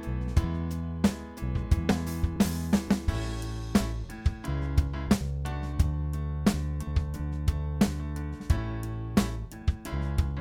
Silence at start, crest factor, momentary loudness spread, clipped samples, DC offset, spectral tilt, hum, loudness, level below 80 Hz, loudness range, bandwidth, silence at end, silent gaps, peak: 0 s; 20 dB; 6 LU; under 0.1%; under 0.1%; -6.5 dB/octave; none; -30 LUFS; -32 dBFS; 2 LU; 17 kHz; 0 s; none; -10 dBFS